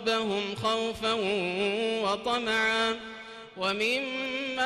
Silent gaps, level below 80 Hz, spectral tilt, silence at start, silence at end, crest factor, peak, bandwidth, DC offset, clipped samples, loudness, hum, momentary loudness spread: none; -62 dBFS; -3.5 dB/octave; 0 s; 0 s; 14 dB; -16 dBFS; 14.5 kHz; under 0.1%; under 0.1%; -28 LUFS; none; 7 LU